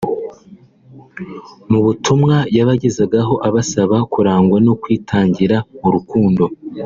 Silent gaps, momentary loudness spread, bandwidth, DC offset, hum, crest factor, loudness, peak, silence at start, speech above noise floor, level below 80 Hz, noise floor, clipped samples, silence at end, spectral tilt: none; 13 LU; 7.6 kHz; under 0.1%; none; 14 dB; -15 LUFS; -2 dBFS; 0 s; 29 dB; -48 dBFS; -43 dBFS; under 0.1%; 0 s; -7 dB/octave